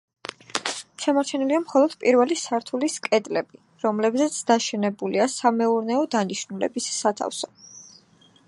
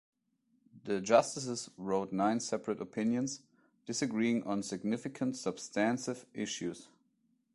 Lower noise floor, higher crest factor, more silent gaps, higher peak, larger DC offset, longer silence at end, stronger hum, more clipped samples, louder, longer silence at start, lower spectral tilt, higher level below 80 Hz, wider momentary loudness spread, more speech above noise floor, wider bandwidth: second, -56 dBFS vs -76 dBFS; about the same, 22 dB vs 22 dB; neither; first, -2 dBFS vs -12 dBFS; neither; about the same, 0.65 s vs 0.7 s; neither; neither; first, -23 LUFS vs -34 LUFS; second, 0.55 s vs 0.75 s; about the same, -3.5 dB/octave vs -4.5 dB/octave; about the same, -76 dBFS vs -74 dBFS; about the same, 11 LU vs 12 LU; second, 34 dB vs 42 dB; about the same, 11.5 kHz vs 11.5 kHz